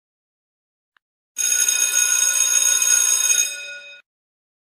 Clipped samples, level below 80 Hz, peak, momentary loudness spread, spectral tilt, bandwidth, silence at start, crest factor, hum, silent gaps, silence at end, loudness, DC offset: under 0.1%; -86 dBFS; -4 dBFS; 18 LU; 6 dB/octave; 15.5 kHz; 1.35 s; 16 dB; none; none; 0.8 s; -15 LUFS; under 0.1%